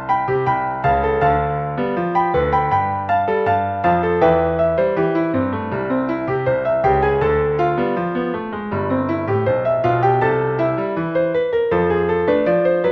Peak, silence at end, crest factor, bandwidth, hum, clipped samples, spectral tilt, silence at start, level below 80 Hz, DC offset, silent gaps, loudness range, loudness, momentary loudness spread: -2 dBFS; 0 s; 16 dB; 6.2 kHz; none; under 0.1%; -9 dB/octave; 0 s; -38 dBFS; under 0.1%; none; 2 LU; -18 LUFS; 5 LU